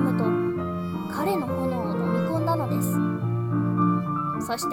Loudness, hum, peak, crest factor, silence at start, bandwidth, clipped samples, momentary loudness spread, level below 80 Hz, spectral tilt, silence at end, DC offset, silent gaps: -26 LUFS; none; -10 dBFS; 14 dB; 0 s; 17 kHz; under 0.1%; 5 LU; -56 dBFS; -7 dB/octave; 0 s; under 0.1%; none